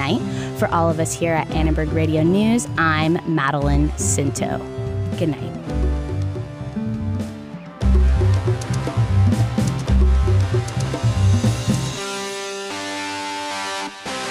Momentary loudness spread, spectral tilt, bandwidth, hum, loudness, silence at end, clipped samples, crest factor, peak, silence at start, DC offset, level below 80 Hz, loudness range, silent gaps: 9 LU; -5.5 dB/octave; 15.5 kHz; none; -21 LUFS; 0 s; under 0.1%; 12 dB; -6 dBFS; 0 s; under 0.1%; -26 dBFS; 5 LU; none